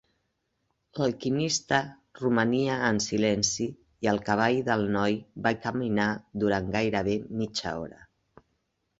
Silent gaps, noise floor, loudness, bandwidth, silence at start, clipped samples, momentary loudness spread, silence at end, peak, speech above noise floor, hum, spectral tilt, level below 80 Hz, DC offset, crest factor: none; -77 dBFS; -27 LUFS; 8 kHz; 0.95 s; under 0.1%; 8 LU; 1.05 s; -8 dBFS; 50 dB; none; -4.5 dB/octave; -56 dBFS; under 0.1%; 20 dB